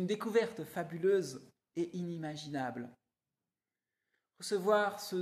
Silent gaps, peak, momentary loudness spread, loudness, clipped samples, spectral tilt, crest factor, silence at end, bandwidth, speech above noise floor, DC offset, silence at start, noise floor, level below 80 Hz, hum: none; -16 dBFS; 15 LU; -35 LUFS; under 0.1%; -5 dB/octave; 20 dB; 0 s; 14.5 kHz; over 55 dB; under 0.1%; 0 s; under -90 dBFS; -82 dBFS; none